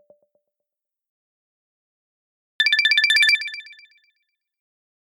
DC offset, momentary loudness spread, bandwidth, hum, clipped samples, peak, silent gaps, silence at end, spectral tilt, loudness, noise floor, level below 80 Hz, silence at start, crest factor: under 0.1%; 15 LU; 15.5 kHz; none; under 0.1%; -6 dBFS; none; 1.6 s; 7 dB/octave; -16 LUFS; -85 dBFS; under -90 dBFS; 2.6 s; 20 dB